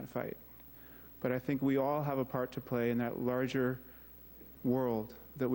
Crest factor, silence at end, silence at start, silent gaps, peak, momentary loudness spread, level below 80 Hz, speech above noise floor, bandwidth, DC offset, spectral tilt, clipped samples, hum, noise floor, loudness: 16 dB; 0 s; 0 s; none; -20 dBFS; 19 LU; -64 dBFS; 20 dB; 16.5 kHz; under 0.1%; -8 dB/octave; under 0.1%; none; -54 dBFS; -35 LUFS